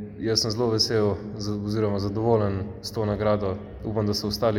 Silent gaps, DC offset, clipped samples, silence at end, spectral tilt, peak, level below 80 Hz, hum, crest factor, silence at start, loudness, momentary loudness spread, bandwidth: none; under 0.1%; under 0.1%; 0 s; -5.5 dB/octave; -8 dBFS; -48 dBFS; none; 16 dB; 0 s; -25 LUFS; 9 LU; 17 kHz